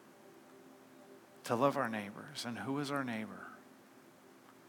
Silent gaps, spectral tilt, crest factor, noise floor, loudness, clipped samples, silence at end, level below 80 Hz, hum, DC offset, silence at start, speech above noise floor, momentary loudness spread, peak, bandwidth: none; -5 dB/octave; 24 dB; -60 dBFS; -38 LUFS; under 0.1%; 0 s; under -90 dBFS; none; under 0.1%; 0 s; 23 dB; 27 LU; -16 dBFS; 19 kHz